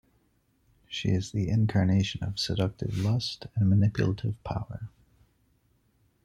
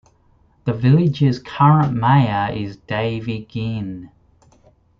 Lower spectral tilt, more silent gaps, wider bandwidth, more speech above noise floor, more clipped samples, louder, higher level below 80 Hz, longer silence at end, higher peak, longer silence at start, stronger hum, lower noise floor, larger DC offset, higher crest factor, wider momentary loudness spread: second, -6.5 dB/octave vs -9 dB/octave; neither; first, 11 kHz vs 6.6 kHz; about the same, 42 dB vs 39 dB; neither; second, -28 LUFS vs -18 LUFS; about the same, -52 dBFS vs -50 dBFS; first, 1.35 s vs 0.95 s; second, -12 dBFS vs -2 dBFS; first, 0.9 s vs 0.65 s; neither; first, -69 dBFS vs -56 dBFS; neither; about the same, 16 dB vs 16 dB; about the same, 11 LU vs 13 LU